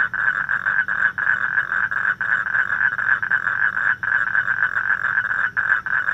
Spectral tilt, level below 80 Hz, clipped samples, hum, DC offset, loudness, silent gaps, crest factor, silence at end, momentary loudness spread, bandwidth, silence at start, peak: -3.5 dB/octave; -58 dBFS; under 0.1%; none; under 0.1%; -19 LUFS; none; 16 dB; 0 s; 2 LU; 8 kHz; 0 s; -4 dBFS